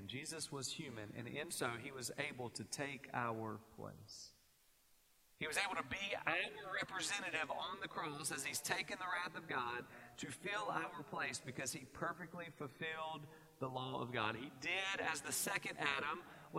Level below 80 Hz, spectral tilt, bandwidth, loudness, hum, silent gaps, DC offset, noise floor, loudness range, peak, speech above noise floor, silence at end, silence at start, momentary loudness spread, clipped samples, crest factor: -76 dBFS; -2.5 dB/octave; 16 kHz; -43 LUFS; none; none; under 0.1%; -73 dBFS; 4 LU; -20 dBFS; 28 dB; 0 s; 0 s; 11 LU; under 0.1%; 24 dB